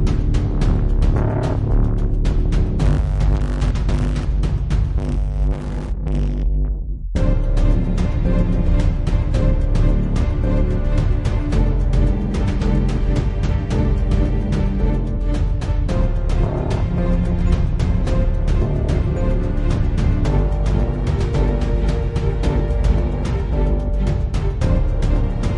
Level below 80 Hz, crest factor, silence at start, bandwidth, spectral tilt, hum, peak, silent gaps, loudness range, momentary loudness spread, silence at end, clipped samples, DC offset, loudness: -18 dBFS; 12 dB; 0 s; 8.4 kHz; -8 dB/octave; none; -6 dBFS; none; 2 LU; 3 LU; 0 s; under 0.1%; under 0.1%; -20 LUFS